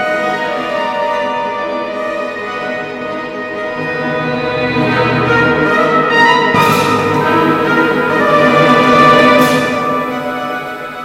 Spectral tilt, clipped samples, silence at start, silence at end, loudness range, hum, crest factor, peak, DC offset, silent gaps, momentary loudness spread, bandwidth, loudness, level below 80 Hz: -5.5 dB/octave; under 0.1%; 0 s; 0 s; 9 LU; none; 12 dB; 0 dBFS; under 0.1%; none; 12 LU; 17 kHz; -12 LUFS; -44 dBFS